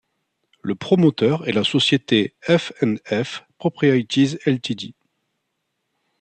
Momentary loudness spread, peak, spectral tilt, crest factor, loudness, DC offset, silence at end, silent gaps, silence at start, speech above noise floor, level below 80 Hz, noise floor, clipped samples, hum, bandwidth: 11 LU; -4 dBFS; -6 dB/octave; 18 dB; -20 LUFS; under 0.1%; 1.3 s; none; 0.65 s; 56 dB; -62 dBFS; -75 dBFS; under 0.1%; none; 9 kHz